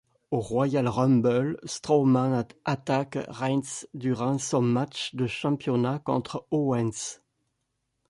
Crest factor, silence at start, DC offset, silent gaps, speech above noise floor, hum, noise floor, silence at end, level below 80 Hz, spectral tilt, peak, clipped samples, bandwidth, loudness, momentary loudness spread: 16 dB; 0.3 s; under 0.1%; none; 52 dB; none; -78 dBFS; 0.95 s; -62 dBFS; -6 dB/octave; -10 dBFS; under 0.1%; 11.5 kHz; -27 LUFS; 9 LU